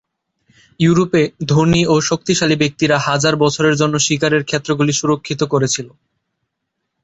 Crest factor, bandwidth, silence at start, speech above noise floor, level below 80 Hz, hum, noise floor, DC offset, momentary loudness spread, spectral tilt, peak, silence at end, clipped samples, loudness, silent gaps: 14 dB; 8.2 kHz; 0.8 s; 60 dB; -48 dBFS; none; -75 dBFS; under 0.1%; 5 LU; -4.5 dB/octave; -2 dBFS; 1.15 s; under 0.1%; -15 LUFS; none